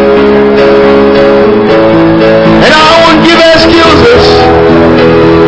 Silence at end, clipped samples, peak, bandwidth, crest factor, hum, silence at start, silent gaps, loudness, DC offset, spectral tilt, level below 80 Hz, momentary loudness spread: 0 s; 20%; 0 dBFS; 8 kHz; 2 dB; none; 0 s; none; -3 LUFS; under 0.1%; -5.5 dB/octave; -24 dBFS; 3 LU